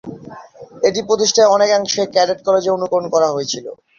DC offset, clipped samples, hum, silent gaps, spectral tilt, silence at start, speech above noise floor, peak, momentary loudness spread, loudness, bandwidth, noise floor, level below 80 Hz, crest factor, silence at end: under 0.1%; under 0.1%; none; none; -2.5 dB/octave; 0.05 s; 22 dB; -2 dBFS; 11 LU; -16 LUFS; 7.4 kHz; -37 dBFS; -60 dBFS; 14 dB; 0.25 s